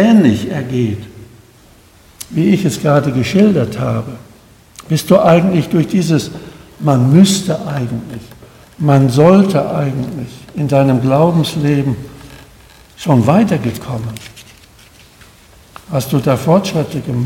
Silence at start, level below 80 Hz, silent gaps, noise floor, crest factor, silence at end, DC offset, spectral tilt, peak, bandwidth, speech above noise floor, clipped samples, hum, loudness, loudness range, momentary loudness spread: 0 s; -46 dBFS; none; -44 dBFS; 14 dB; 0 s; under 0.1%; -7 dB/octave; 0 dBFS; 17 kHz; 32 dB; 0.2%; none; -13 LUFS; 5 LU; 18 LU